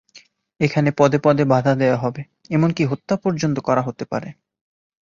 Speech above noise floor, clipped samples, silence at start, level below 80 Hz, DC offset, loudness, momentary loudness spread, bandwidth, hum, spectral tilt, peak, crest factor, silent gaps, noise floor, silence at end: 32 dB; under 0.1%; 0.15 s; -56 dBFS; under 0.1%; -19 LUFS; 11 LU; 7.4 kHz; none; -7 dB/octave; -2 dBFS; 18 dB; none; -51 dBFS; 0.8 s